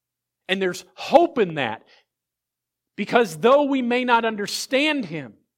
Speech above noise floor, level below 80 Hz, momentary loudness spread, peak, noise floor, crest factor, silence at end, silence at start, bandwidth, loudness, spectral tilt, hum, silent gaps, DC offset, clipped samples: 64 dB; -70 dBFS; 14 LU; -2 dBFS; -85 dBFS; 22 dB; 0.25 s; 0.5 s; 16.5 kHz; -21 LUFS; -4 dB/octave; none; none; under 0.1%; under 0.1%